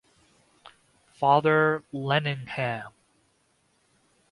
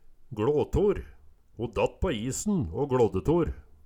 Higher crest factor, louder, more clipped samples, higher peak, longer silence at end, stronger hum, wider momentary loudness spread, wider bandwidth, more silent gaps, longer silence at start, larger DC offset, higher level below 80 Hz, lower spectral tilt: first, 22 dB vs 16 dB; first, -25 LUFS vs -28 LUFS; neither; first, -6 dBFS vs -12 dBFS; first, 1.4 s vs 0.25 s; neither; about the same, 11 LU vs 9 LU; second, 11.5 kHz vs 17.5 kHz; neither; first, 1.2 s vs 0.2 s; neither; second, -68 dBFS vs -42 dBFS; about the same, -7 dB/octave vs -6.5 dB/octave